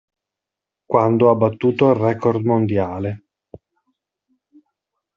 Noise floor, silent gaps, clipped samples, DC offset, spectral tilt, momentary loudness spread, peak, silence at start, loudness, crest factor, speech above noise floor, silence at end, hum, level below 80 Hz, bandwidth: -85 dBFS; none; under 0.1%; under 0.1%; -7.5 dB/octave; 11 LU; -2 dBFS; 0.9 s; -18 LUFS; 18 dB; 69 dB; 2 s; none; -60 dBFS; 6.8 kHz